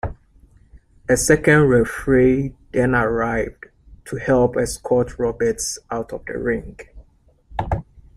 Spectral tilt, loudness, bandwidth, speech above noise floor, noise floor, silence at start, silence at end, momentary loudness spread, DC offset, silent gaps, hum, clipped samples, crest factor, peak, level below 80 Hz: -5.5 dB/octave; -19 LUFS; 15 kHz; 36 dB; -55 dBFS; 0.05 s; 0.15 s; 15 LU; under 0.1%; none; none; under 0.1%; 18 dB; -2 dBFS; -38 dBFS